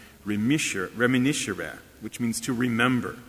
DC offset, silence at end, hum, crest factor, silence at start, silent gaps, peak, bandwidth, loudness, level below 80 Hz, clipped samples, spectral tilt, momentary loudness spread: under 0.1%; 0.05 s; none; 20 dB; 0 s; none; -6 dBFS; 16 kHz; -26 LUFS; -56 dBFS; under 0.1%; -4.5 dB/octave; 12 LU